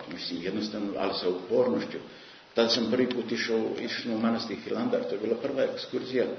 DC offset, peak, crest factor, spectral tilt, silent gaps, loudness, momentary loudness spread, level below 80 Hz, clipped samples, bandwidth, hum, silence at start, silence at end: under 0.1%; -10 dBFS; 20 dB; -5 dB/octave; none; -29 LUFS; 8 LU; -70 dBFS; under 0.1%; 6.6 kHz; none; 0 s; 0 s